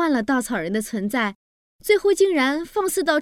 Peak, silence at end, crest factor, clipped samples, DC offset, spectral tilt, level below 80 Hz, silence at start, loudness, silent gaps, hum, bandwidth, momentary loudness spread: -6 dBFS; 0 s; 16 dB; under 0.1%; under 0.1%; -4 dB/octave; -54 dBFS; 0 s; -21 LUFS; 1.35-1.79 s; none; 17 kHz; 7 LU